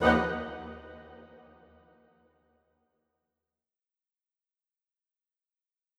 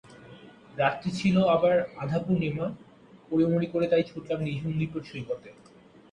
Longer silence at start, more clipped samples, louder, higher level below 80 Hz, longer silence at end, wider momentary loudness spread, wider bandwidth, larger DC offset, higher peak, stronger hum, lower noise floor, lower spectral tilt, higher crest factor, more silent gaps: about the same, 0 s vs 0.1 s; neither; second, -31 LUFS vs -27 LUFS; about the same, -56 dBFS vs -60 dBFS; first, 4.7 s vs 0.6 s; first, 27 LU vs 13 LU; about the same, 11 kHz vs 10 kHz; neither; about the same, -10 dBFS vs -12 dBFS; neither; first, -90 dBFS vs -50 dBFS; about the same, -6.5 dB/octave vs -7.5 dB/octave; first, 28 dB vs 16 dB; neither